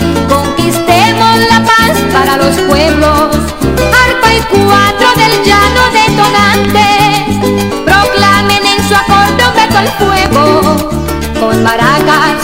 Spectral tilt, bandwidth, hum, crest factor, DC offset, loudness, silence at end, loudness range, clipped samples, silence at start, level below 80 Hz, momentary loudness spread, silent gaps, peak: -4 dB/octave; 16.5 kHz; none; 8 dB; 2%; -7 LUFS; 0 s; 2 LU; 0.8%; 0 s; -24 dBFS; 5 LU; none; 0 dBFS